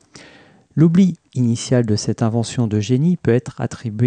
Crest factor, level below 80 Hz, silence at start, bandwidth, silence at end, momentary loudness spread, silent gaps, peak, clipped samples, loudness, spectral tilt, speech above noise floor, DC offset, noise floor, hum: 14 dB; -54 dBFS; 0.15 s; 9.6 kHz; 0 s; 10 LU; none; -4 dBFS; under 0.1%; -18 LUFS; -7 dB/octave; 31 dB; under 0.1%; -48 dBFS; none